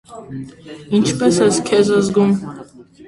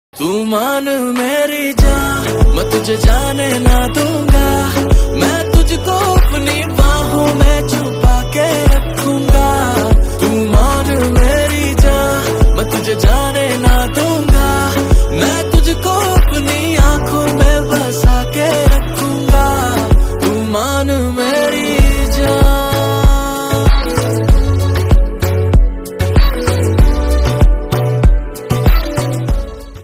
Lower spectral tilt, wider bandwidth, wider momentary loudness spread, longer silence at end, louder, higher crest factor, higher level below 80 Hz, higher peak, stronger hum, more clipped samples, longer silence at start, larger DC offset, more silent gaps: about the same, -5.5 dB/octave vs -5.5 dB/octave; second, 11.5 kHz vs 16.5 kHz; first, 19 LU vs 3 LU; about the same, 0.05 s vs 0 s; about the same, -15 LUFS vs -13 LUFS; first, 16 dB vs 10 dB; second, -52 dBFS vs -14 dBFS; about the same, -2 dBFS vs 0 dBFS; neither; neither; about the same, 0.1 s vs 0.15 s; neither; neither